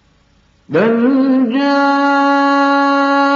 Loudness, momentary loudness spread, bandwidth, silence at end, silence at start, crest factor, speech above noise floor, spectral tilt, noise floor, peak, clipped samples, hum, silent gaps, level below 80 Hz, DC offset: -12 LUFS; 2 LU; 7.2 kHz; 0 s; 0.7 s; 12 dB; 41 dB; -3 dB/octave; -53 dBFS; 0 dBFS; under 0.1%; none; none; -62 dBFS; under 0.1%